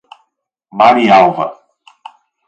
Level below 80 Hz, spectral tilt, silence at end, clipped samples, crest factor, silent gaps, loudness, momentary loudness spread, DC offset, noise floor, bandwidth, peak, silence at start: -56 dBFS; -6 dB/octave; 0.95 s; under 0.1%; 14 dB; none; -10 LUFS; 15 LU; under 0.1%; -67 dBFS; 8.2 kHz; 0 dBFS; 0.75 s